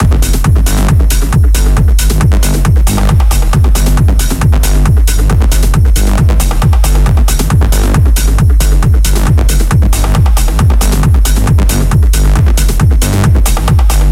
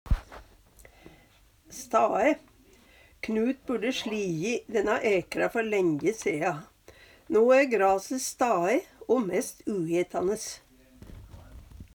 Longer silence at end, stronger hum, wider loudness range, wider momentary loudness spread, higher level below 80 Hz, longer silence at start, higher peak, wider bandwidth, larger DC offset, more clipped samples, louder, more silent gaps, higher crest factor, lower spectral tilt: about the same, 0 s vs 0.1 s; neither; second, 0 LU vs 5 LU; second, 1 LU vs 11 LU; first, -8 dBFS vs -44 dBFS; about the same, 0 s vs 0.05 s; first, 0 dBFS vs -10 dBFS; second, 16.5 kHz vs over 20 kHz; neither; neither; first, -10 LUFS vs -27 LUFS; neither; second, 6 dB vs 18 dB; about the same, -5.5 dB/octave vs -4.5 dB/octave